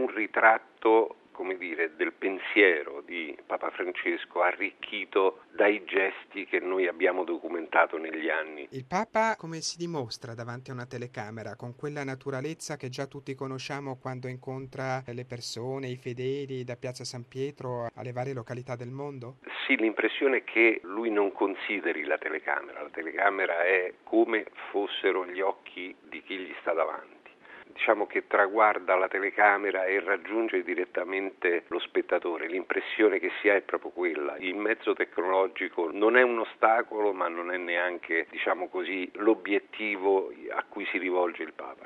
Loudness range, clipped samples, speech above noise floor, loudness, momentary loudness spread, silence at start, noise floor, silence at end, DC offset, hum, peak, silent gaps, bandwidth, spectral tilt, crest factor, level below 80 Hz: 10 LU; under 0.1%; 22 dB; -29 LUFS; 15 LU; 0 s; -51 dBFS; 0 s; under 0.1%; none; -4 dBFS; none; 11.5 kHz; -5 dB/octave; 24 dB; -76 dBFS